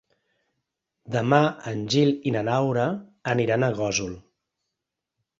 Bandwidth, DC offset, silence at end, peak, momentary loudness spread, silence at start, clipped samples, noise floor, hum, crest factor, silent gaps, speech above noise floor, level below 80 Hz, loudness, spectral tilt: 7.8 kHz; under 0.1%; 1.2 s; -4 dBFS; 10 LU; 1.05 s; under 0.1%; -84 dBFS; none; 22 dB; none; 61 dB; -58 dBFS; -24 LUFS; -5.5 dB/octave